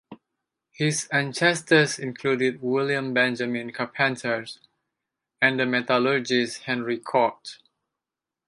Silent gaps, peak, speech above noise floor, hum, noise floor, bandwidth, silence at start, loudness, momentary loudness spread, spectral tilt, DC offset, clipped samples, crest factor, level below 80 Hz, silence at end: none; -6 dBFS; 64 dB; none; -88 dBFS; 11.5 kHz; 0.1 s; -24 LUFS; 9 LU; -4 dB/octave; under 0.1%; under 0.1%; 20 dB; -74 dBFS; 0.9 s